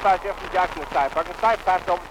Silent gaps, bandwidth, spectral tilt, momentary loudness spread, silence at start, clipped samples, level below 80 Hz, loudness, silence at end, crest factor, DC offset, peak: none; 16 kHz; -4 dB/octave; 3 LU; 0 s; under 0.1%; -44 dBFS; -23 LUFS; 0 s; 14 dB; under 0.1%; -8 dBFS